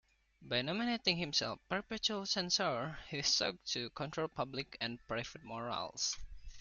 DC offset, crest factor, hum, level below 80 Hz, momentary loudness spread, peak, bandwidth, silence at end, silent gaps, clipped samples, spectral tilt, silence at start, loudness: under 0.1%; 24 dB; none; -60 dBFS; 9 LU; -16 dBFS; 11 kHz; 0 s; none; under 0.1%; -2.5 dB/octave; 0.4 s; -37 LUFS